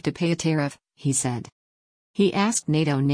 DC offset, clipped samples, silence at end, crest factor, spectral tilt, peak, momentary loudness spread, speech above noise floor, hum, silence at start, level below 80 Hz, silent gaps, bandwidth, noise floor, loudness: under 0.1%; under 0.1%; 0 s; 16 dB; -5 dB/octave; -8 dBFS; 9 LU; over 67 dB; none; 0.05 s; -60 dBFS; 1.52-2.14 s; 10.5 kHz; under -90 dBFS; -24 LUFS